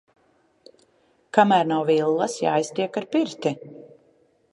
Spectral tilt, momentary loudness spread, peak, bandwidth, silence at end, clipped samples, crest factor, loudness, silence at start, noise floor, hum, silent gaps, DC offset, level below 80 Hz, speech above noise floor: -5 dB/octave; 10 LU; -2 dBFS; 11.5 kHz; 0.7 s; under 0.1%; 22 dB; -22 LUFS; 1.35 s; -63 dBFS; none; none; under 0.1%; -76 dBFS; 42 dB